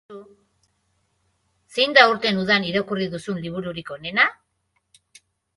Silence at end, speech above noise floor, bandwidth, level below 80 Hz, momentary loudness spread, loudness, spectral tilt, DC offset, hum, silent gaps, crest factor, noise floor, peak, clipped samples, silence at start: 1.25 s; 50 dB; 11.5 kHz; -62 dBFS; 16 LU; -20 LUFS; -4.5 dB/octave; under 0.1%; none; none; 24 dB; -72 dBFS; 0 dBFS; under 0.1%; 0.1 s